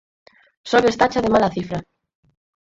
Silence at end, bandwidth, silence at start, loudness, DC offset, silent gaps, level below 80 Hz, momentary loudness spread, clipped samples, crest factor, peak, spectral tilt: 1 s; 7.8 kHz; 0.65 s; -19 LUFS; under 0.1%; none; -50 dBFS; 14 LU; under 0.1%; 20 dB; -2 dBFS; -5.5 dB/octave